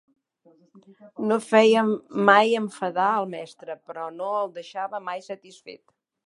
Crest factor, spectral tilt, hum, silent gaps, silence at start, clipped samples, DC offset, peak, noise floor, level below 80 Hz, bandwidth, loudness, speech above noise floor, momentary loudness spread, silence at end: 22 dB; -5 dB/octave; none; none; 1.05 s; under 0.1%; under 0.1%; -2 dBFS; -60 dBFS; -82 dBFS; 11.5 kHz; -23 LUFS; 36 dB; 21 LU; 0.55 s